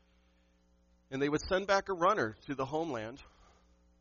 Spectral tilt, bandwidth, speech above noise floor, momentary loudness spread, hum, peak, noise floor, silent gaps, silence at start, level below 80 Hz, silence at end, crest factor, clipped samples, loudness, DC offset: -3.5 dB/octave; 7.2 kHz; 36 dB; 13 LU; 60 Hz at -65 dBFS; -16 dBFS; -69 dBFS; none; 1.1 s; -60 dBFS; 0.75 s; 20 dB; under 0.1%; -33 LUFS; under 0.1%